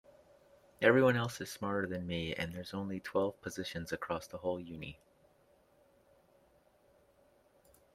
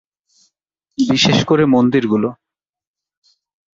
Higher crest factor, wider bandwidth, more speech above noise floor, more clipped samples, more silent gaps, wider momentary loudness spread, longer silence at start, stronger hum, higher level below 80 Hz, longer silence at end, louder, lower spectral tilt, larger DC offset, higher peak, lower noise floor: first, 24 dB vs 16 dB; first, 15.5 kHz vs 7.6 kHz; second, 34 dB vs 72 dB; neither; neither; first, 14 LU vs 10 LU; second, 0.8 s vs 1 s; neither; second, -68 dBFS vs -52 dBFS; first, 3 s vs 1.45 s; second, -35 LUFS vs -14 LUFS; about the same, -5.5 dB/octave vs -5.5 dB/octave; neither; second, -14 dBFS vs -2 dBFS; second, -69 dBFS vs -86 dBFS